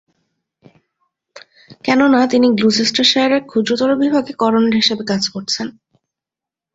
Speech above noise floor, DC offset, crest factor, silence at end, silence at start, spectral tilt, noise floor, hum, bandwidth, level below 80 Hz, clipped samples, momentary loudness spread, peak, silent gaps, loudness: 72 dB; under 0.1%; 16 dB; 1.05 s; 1.35 s; -4 dB/octave; -87 dBFS; none; 8 kHz; -58 dBFS; under 0.1%; 8 LU; -2 dBFS; none; -15 LUFS